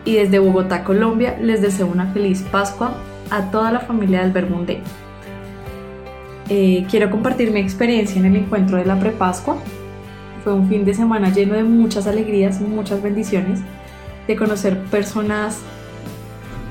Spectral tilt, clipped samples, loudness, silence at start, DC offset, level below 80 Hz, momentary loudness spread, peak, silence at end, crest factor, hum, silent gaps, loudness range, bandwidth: -6.5 dB/octave; under 0.1%; -18 LUFS; 0 s; 0.2%; -42 dBFS; 18 LU; -2 dBFS; 0 s; 14 dB; none; none; 4 LU; 15.5 kHz